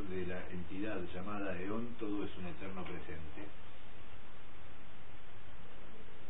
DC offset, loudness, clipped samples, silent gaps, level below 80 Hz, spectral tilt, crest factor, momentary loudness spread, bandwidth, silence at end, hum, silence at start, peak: 2%; -44 LUFS; under 0.1%; none; -60 dBFS; -9 dB/octave; 16 dB; 15 LU; 4 kHz; 0 s; none; 0 s; -24 dBFS